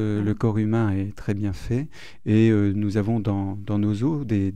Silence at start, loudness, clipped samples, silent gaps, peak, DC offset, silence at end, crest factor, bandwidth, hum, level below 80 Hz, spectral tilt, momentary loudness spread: 0 s; -23 LUFS; under 0.1%; none; -8 dBFS; 1%; 0 s; 14 dB; 9 kHz; none; -46 dBFS; -9 dB/octave; 9 LU